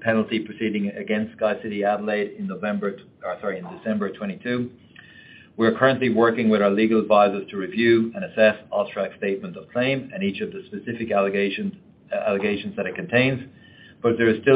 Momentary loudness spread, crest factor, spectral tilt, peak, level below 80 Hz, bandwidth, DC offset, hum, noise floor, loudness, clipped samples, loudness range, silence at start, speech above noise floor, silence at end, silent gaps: 12 LU; 20 dB; -10.5 dB/octave; -4 dBFS; -66 dBFS; 4.9 kHz; under 0.1%; none; -48 dBFS; -23 LUFS; under 0.1%; 7 LU; 0 s; 25 dB; 0 s; none